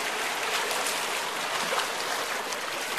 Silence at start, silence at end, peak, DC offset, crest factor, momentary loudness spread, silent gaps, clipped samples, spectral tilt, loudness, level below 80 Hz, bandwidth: 0 s; 0 s; -12 dBFS; 0.1%; 18 dB; 3 LU; none; under 0.1%; 0 dB/octave; -28 LUFS; -70 dBFS; 14 kHz